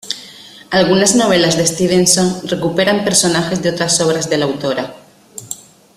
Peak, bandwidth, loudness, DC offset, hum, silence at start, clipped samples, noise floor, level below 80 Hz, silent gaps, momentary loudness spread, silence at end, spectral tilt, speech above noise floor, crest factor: 0 dBFS; 15.5 kHz; -13 LUFS; under 0.1%; none; 0.05 s; under 0.1%; -37 dBFS; -50 dBFS; none; 18 LU; 0.4 s; -3.5 dB/octave; 24 dB; 16 dB